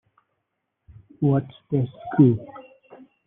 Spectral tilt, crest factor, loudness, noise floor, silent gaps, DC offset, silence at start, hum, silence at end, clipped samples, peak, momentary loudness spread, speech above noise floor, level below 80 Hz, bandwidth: -10 dB/octave; 20 dB; -22 LUFS; -78 dBFS; none; under 0.1%; 1.2 s; none; 0.65 s; under 0.1%; -4 dBFS; 10 LU; 57 dB; -60 dBFS; 3.8 kHz